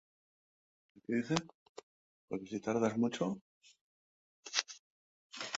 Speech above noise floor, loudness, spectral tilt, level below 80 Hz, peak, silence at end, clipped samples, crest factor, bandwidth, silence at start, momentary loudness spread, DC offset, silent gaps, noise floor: over 55 dB; -37 LUFS; -4 dB/octave; -76 dBFS; -10 dBFS; 0 s; under 0.1%; 30 dB; 8 kHz; 1.1 s; 21 LU; under 0.1%; 1.54-1.75 s, 1.83-2.28 s, 3.41-3.61 s, 3.81-4.43 s, 4.79-5.30 s; under -90 dBFS